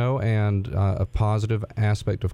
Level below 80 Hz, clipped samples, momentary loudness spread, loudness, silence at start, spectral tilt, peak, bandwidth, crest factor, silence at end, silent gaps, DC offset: -38 dBFS; under 0.1%; 2 LU; -24 LUFS; 0 s; -8 dB/octave; -10 dBFS; 9.8 kHz; 12 dB; 0 s; none; under 0.1%